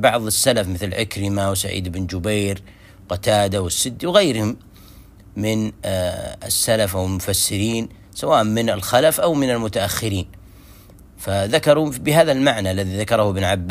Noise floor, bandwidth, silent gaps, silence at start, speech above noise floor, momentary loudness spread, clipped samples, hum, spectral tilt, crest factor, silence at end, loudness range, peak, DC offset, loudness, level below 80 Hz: -44 dBFS; 16 kHz; none; 0 s; 25 dB; 10 LU; under 0.1%; none; -4 dB/octave; 20 dB; 0 s; 3 LU; 0 dBFS; under 0.1%; -19 LUFS; -44 dBFS